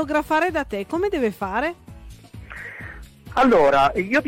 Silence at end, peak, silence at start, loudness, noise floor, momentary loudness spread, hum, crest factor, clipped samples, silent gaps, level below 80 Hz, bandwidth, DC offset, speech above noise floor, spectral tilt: 0 s; -10 dBFS; 0 s; -20 LUFS; -42 dBFS; 22 LU; none; 12 dB; under 0.1%; none; -44 dBFS; 16.5 kHz; under 0.1%; 22 dB; -5.5 dB/octave